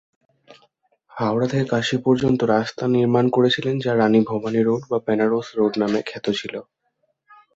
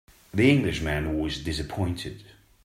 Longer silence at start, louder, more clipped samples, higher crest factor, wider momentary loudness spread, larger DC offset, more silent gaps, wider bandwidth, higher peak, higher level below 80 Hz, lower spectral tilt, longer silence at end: first, 0.5 s vs 0.35 s; first, -20 LUFS vs -26 LUFS; neither; about the same, 16 dB vs 20 dB; second, 8 LU vs 14 LU; neither; neither; second, 8 kHz vs 16 kHz; about the same, -4 dBFS vs -6 dBFS; second, -58 dBFS vs -42 dBFS; about the same, -6.5 dB/octave vs -6 dB/octave; first, 0.95 s vs 0.4 s